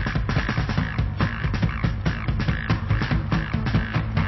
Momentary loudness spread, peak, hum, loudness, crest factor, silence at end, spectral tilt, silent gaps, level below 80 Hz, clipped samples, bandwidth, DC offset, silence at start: 2 LU; -8 dBFS; none; -25 LUFS; 16 dB; 0 s; -7.5 dB/octave; none; -30 dBFS; under 0.1%; 6 kHz; under 0.1%; 0 s